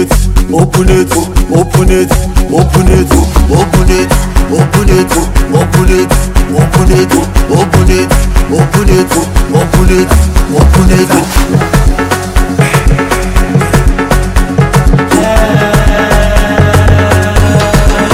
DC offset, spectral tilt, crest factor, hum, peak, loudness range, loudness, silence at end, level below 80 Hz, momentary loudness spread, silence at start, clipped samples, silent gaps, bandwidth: 0.7%; -5.5 dB/octave; 6 dB; none; 0 dBFS; 1 LU; -8 LUFS; 0 s; -10 dBFS; 4 LU; 0 s; 8%; none; 16.5 kHz